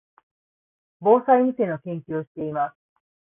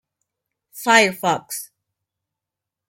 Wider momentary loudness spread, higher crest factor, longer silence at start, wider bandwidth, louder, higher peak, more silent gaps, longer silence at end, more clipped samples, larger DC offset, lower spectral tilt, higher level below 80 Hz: second, 13 LU vs 16 LU; about the same, 20 dB vs 22 dB; first, 1 s vs 0.75 s; second, 3.7 kHz vs 17 kHz; second, -23 LUFS vs -17 LUFS; second, -6 dBFS vs 0 dBFS; first, 2.27-2.35 s vs none; second, 0.6 s vs 1.25 s; neither; neither; first, -12 dB/octave vs -2.5 dB/octave; about the same, -70 dBFS vs -70 dBFS